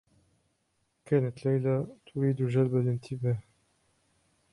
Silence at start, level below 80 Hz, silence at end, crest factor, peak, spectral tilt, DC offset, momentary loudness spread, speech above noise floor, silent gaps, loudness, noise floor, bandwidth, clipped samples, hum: 1.1 s; -66 dBFS; 1.1 s; 18 dB; -12 dBFS; -9.5 dB/octave; under 0.1%; 6 LU; 47 dB; none; -30 LUFS; -76 dBFS; 11 kHz; under 0.1%; none